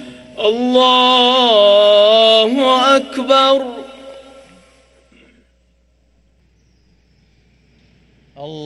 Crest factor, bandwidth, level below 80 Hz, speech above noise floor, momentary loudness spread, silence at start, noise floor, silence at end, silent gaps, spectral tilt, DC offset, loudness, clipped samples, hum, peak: 14 dB; 12 kHz; -58 dBFS; 45 dB; 23 LU; 0 s; -56 dBFS; 0 s; none; -3 dB/octave; under 0.1%; -11 LUFS; under 0.1%; none; 0 dBFS